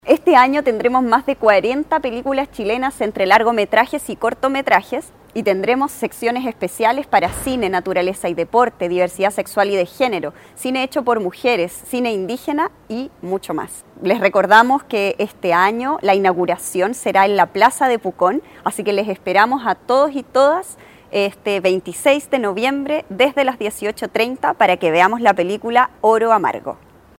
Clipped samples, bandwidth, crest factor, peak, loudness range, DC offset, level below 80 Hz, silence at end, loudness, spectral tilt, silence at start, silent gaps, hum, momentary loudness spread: under 0.1%; 17 kHz; 16 dB; 0 dBFS; 4 LU; under 0.1%; -52 dBFS; 0.45 s; -17 LUFS; -4 dB/octave; 0.05 s; none; none; 9 LU